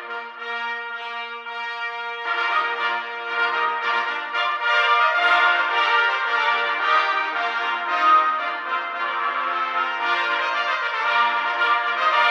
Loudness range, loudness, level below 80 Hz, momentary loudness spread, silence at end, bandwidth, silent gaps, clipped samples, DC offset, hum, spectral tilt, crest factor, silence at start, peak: 5 LU; -21 LUFS; -84 dBFS; 11 LU; 0 s; 8.4 kHz; none; under 0.1%; under 0.1%; none; 0 dB/octave; 16 dB; 0 s; -6 dBFS